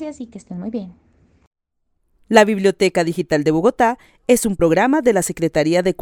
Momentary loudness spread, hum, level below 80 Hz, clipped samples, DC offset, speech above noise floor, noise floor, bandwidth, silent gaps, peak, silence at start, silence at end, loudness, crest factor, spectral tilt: 16 LU; none; -46 dBFS; under 0.1%; under 0.1%; 52 dB; -69 dBFS; 18.5 kHz; 1.47-1.51 s; 0 dBFS; 0 s; 0.1 s; -17 LUFS; 18 dB; -5 dB/octave